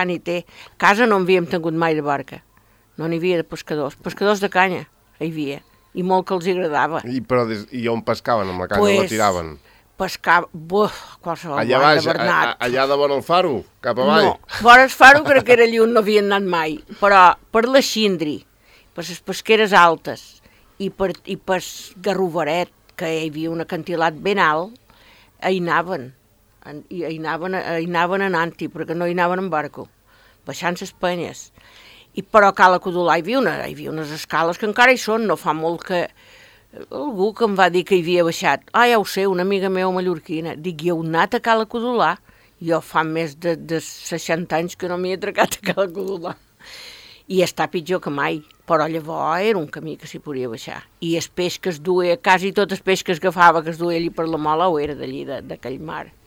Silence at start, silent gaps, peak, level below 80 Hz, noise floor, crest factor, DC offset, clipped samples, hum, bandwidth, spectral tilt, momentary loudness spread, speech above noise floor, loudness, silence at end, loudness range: 0 s; none; 0 dBFS; -54 dBFS; -55 dBFS; 20 dB; under 0.1%; under 0.1%; none; 17.5 kHz; -4.5 dB/octave; 16 LU; 36 dB; -18 LUFS; 0.2 s; 10 LU